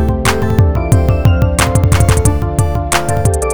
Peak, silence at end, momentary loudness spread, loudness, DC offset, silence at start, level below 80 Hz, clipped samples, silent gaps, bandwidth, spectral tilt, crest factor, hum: 0 dBFS; 0 s; 4 LU; -12 LUFS; 4%; 0 s; -18 dBFS; 0.5%; none; over 20 kHz; -5.5 dB/octave; 12 dB; none